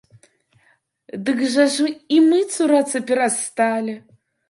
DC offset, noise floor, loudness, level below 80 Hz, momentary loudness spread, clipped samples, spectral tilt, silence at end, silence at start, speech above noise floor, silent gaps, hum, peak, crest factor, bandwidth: under 0.1%; -61 dBFS; -19 LUFS; -72 dBFS; 11 LU; under 0.1%; -3 dB/octave; 0.5 s; 1.15 s; 43 dB; none; none; -4 dBFS; 16 dB; 11.5 kHz